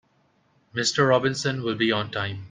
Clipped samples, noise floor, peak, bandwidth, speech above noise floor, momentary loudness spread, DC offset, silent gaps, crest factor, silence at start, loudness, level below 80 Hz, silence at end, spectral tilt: under 0.1%; -65 dBFS; -6 dBFS; 9.8 kHz; 41 dB; 9 LU; under 0.1%; none; 18 dB; 0.75 s; -24 LUFS; -64 dBFS; 0 s; -4 dB/octave